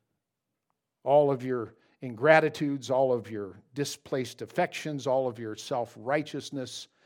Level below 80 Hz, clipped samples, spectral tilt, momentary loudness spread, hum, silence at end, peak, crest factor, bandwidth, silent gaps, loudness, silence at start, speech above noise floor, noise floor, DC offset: -80 dBFS; under 0.1%; -5 dB/octave; 16 LU; none; 0.2 s; -6 dBFS; 24 dB; 16.5 kHz; none; -29 LUFS; 1.05 s; 57 dB; -85 dBFS; under 0.1%